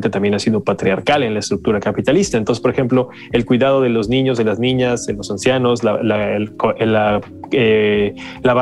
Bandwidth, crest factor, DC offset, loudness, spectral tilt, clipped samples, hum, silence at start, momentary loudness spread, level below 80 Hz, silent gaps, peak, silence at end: 12 kHz; 12 dB; under 0.1%; -16 LUFS; -5.5 dB/octave; under 0.1%; none; 0 s; 5 LU; -44 dBFS; none; -2 dBFS; 0 s